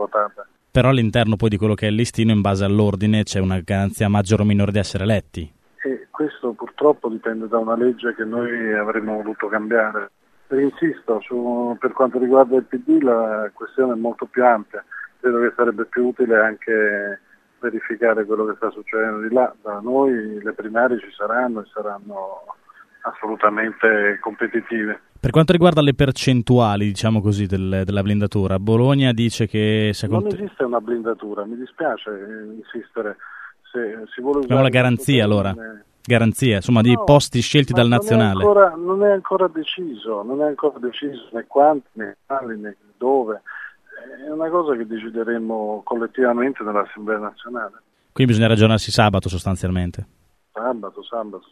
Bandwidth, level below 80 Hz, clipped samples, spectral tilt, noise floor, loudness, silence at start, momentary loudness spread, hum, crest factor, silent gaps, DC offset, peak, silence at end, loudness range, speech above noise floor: 13.5 kHz; -46 dBFS; under 0.1%; -6.5 dB/octave; -40 dBFS; -19 LUFS; 0 s; 14 LU; none; 20 dB; none; under 0.1%; 0 dBFS; 0.15 s; 7 LU; 21 dB